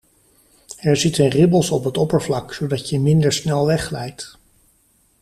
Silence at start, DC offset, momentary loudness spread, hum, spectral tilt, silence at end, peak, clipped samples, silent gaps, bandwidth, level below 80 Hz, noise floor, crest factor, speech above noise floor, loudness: 0.7 s; under 0.1%; 14 LU; none; -5.5 dB/octave; 0.9 s; -2 dBFS; under 0.1%; none; 14 kHz; -48 dBFS; -59 dBFS; 16 dB; 42 dB; -18 LUFS